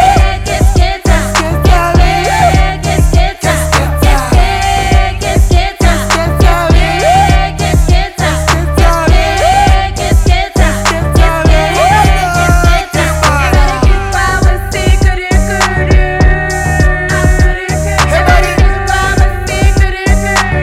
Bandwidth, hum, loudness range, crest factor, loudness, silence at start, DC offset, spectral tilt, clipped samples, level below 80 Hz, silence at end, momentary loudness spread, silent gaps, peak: 15.5 kHz; none; 1 LU; 8 dB; -10 LUFS; 0 s; under 0.1%; -5 dB/octave; 0.1%; -12 dBFS; 0 s; 4 LU; none; 0 dBFS